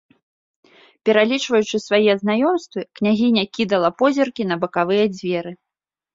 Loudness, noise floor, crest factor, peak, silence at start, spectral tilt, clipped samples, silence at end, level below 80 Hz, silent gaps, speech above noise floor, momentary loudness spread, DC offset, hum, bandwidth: -19 LUFS; -86 dBFS; 18 dB; -2 dBFS; 1.05 s; -5 dB/octave; under 0.1%; 0.6 s; -64 dBFS; none; 68 dB; 8 LU; under 0.1%; none; 7.8 kHz